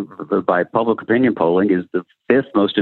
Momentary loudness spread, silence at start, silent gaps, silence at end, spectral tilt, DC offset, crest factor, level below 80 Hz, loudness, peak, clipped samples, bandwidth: 6 LU; 0 s; none; 0 s; -9 dB/octave; under 0.1%; 16 dB; -64 dBFS; -18 LUFS; 0 dBFS; under 0.1%; 4.3 kHz